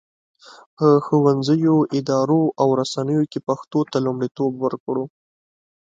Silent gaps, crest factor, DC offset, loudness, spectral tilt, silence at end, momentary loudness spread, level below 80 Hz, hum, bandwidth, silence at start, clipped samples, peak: 0.66-0.77 s, 4.31-4.35 s, 4.80-4.87 s; 18 dB; under 0.1%; -20 LUFS; -7.5 dB/octave; 0.8 s; 9 LU; -66 dBFS; none; 7.8 kHz; 0.5 s; under 0.1%; -2 dBFS